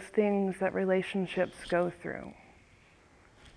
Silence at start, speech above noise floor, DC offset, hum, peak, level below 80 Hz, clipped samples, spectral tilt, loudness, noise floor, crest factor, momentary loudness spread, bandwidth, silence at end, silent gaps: 0 s; 30 dB; under 0.1%; none; -16 dBFS; -62 dBFS; under 0.1%; -7 dB/octave; -31 LUFS; -61 dBFS; 18 dB; 12 LU; 11 kHz; 0.05 s; none